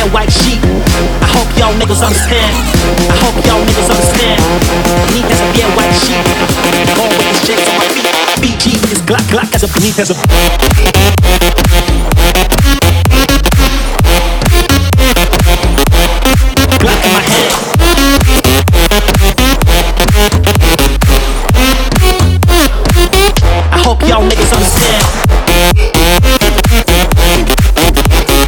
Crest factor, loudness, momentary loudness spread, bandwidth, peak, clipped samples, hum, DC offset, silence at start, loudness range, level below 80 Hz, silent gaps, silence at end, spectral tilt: 8 dB; -9 LUFS; 2 LU; over 20 kHz; 0 dBFS; 0.4%; none; under 0.1%; 0 s; 1 LU; -12 dBFS; none; 0 s; -4 dB/octave